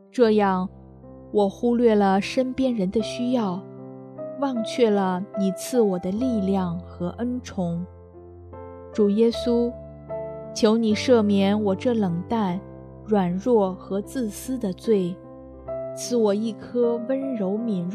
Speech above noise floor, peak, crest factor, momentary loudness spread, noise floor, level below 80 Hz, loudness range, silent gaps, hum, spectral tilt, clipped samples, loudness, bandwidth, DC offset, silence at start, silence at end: 22 dB; -6 dBFS; 18 dB; 15 LU; -44 dBFS; -54 dBFS; 4 LU; none; none; -6.5 dB/octave; under 0.1%; -23 LUFS; 13.5 kHz; under 0.1%; 0.15 s; 0 s